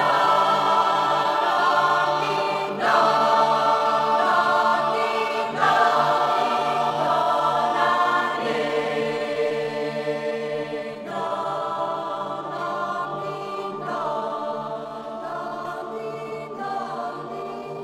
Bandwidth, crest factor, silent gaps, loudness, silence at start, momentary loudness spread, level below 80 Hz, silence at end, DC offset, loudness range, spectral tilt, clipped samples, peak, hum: 16 kHz; 16 dB; none; -22 LUFS; 0 s; 13 LU; -68 dBFS; 0 s; under 0.1%; 10 LU; -4 dB/octave; under 0.1%; -6 dBFS; none